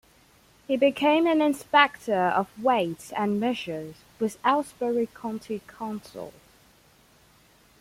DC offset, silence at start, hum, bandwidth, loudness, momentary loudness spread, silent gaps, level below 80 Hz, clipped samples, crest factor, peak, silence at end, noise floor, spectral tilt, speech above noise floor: under 0.1%; 0.7 s; none; 16.5 kHz; -25 LUFS; 16 LU; none; -66 dBFS; under 0.1%; 22 dB; -4 dBFS; 1.5 s; -59 dBFS; -5 dB/octave; 33 dB